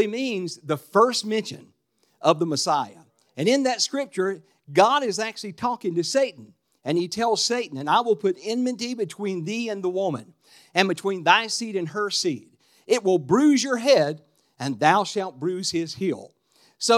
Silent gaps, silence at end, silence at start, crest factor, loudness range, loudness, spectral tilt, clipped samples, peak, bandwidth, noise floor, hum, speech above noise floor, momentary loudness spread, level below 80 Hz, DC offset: none; 0 s; 0 s; 24 dB; 3 LU; -23 LUFS; -4 dB/octave; under 0.1%; 0 dBFS; 15 kHz; -59 dBFS; none; 36 dB; 10 LU; -76 dBFS; under 0.1%